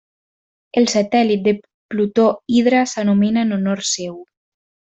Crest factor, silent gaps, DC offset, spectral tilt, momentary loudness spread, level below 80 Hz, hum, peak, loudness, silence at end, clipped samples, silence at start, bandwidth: 14 dB; 1.74-1.89 s; under 0.1%; -5 dB/octave; 8 LU; -60 dBFS; none; -4 dBFS; -17 LUFS; 0.65 s; under 0.1%; 0.75 s; 8.4 kHz